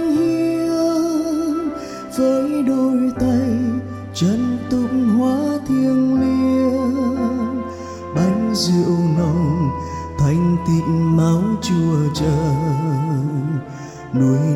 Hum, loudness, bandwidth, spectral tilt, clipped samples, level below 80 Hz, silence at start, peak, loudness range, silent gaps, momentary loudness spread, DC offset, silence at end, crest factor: none; -18 LUFS; 13 kHz; -7.5 dB/octave; under 0.1%; -42 dBFS; 0 s; -6 dBFS; 2 LU; none; 8 LU; under 0.1%; 0 s; 12 dB